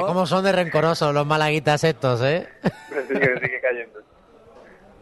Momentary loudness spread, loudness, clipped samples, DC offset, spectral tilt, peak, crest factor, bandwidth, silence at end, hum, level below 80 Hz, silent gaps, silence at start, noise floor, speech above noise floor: 8 LU; -21 LUFS; under 0.1%; under 0.1%; -5.5 dB/octave; -4 dBFS; 18 dB; 12.5 kHz; 0.4 s; none; -58 dBFS; none; 0 s; -49 dBFS; 28 dB